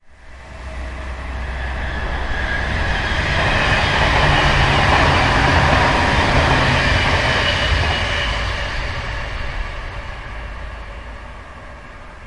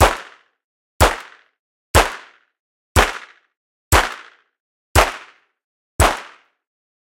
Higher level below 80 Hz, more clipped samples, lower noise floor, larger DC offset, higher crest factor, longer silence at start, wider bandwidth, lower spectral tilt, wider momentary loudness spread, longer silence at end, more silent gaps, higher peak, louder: about the same, -26 dBFS vs -28 dBFS; neither; second, -38 dBFS vs -43 dBFS; neither; about the same, 16 dB vs 20 dB; about the same, 0.1 s vs 0 s; second, 11.5 kHz vs 17 kHz; about the same, -4.5 dB/octave vs -3.5 dB/octave; about the same, 20 LU vs 18 LU; second, 0 s vs 0.8 s; second, none vs 0.64-1.00 s, 1.59-1.94 s, 2.60-2.95 s, 3.57-3.91 s, 4.60-4.95 s, 5.64-5.99 s; about the same, -2 dBFS vs 0 dBFS; about the same, -17 LUFS vs -18 LUFS